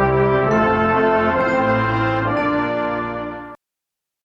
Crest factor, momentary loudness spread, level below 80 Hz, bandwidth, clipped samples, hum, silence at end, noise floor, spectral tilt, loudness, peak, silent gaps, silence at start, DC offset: 12 dB; 11 LU; -40 dBFS; 7.2 kHz; under 0.1%; none; 0.7 s; -84 dBFS; -8 dB/octave; -18 LUFS; -6 dBFS; none; 0 s; under 0.1%